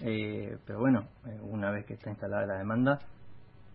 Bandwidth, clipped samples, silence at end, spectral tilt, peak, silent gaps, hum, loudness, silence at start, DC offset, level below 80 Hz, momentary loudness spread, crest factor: 4.7 kHz; under 0.1%; 0 s; -11 dB/octave; -16 dBFS; none; none; -33 LUFS; 0 s; under 0.1%; -62 dBFS; 12 LU; 18 dB